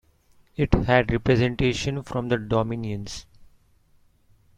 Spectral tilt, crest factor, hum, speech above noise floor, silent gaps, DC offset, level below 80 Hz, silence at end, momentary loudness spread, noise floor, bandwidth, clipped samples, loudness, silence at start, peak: -6.5 dB/octave; 22 dB; none; 37 dB; none; under 0.1%; -38 dBFS; 1.15 s; 14 LU; -60 dBFS; 10.5 kHz; under 0.1%; -24 LUFS; 0.6 s; -4 dBFS